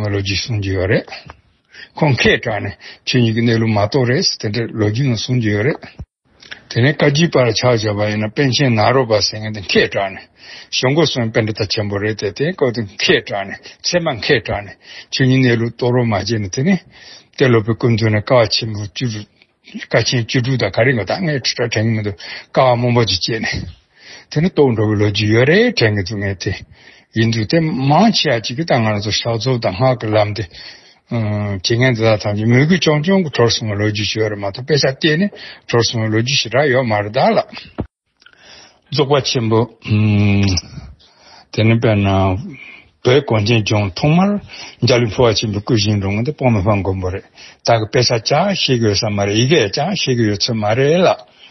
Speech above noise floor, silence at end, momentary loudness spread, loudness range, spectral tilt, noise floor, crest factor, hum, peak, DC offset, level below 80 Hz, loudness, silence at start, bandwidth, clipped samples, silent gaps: 36 dB; 0.25 s; 11 LU; 3 LU; -5.5 dB/octave; -51 dBFS; 16 dB; none; 0 dBFS; under 0.1%; -44 dBFS; -15 LUFS; 0 s; 6.2 kHz; under 0.1%; none